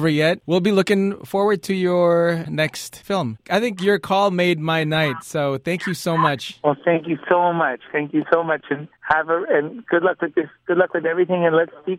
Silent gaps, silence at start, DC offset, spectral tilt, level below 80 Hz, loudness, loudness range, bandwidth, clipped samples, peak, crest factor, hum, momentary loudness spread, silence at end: none; 0 s; under 0.1%; -6 dB/octave; -60 dBFS; -20 LUFS; 1 LU; 16 kHz; under 0.1%; -2 dBFS; 18 dB; none; 6 LU; 0 s